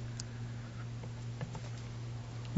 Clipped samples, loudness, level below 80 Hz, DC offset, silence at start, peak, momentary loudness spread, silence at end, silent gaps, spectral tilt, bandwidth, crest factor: under 0.1%; -44 LUFS; -56 dBFS; under 0.1%; 0 s; -18 dBFS; 1 LU; 0 s; none; -6 dB/octave; 7.6 kHz; 24 dB